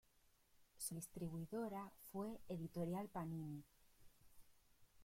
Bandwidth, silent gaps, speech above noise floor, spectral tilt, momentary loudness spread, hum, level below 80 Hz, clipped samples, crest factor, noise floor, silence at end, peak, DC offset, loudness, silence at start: 16.5 kHz; none; 27 dB; -6 dB/octave; 7 LU; none; -74 dBFS; under 0.1%; 16 dB; -76 dBFS; 0 s; -36 dBFS; under 0.1%; -50 LUFS; 0.55 s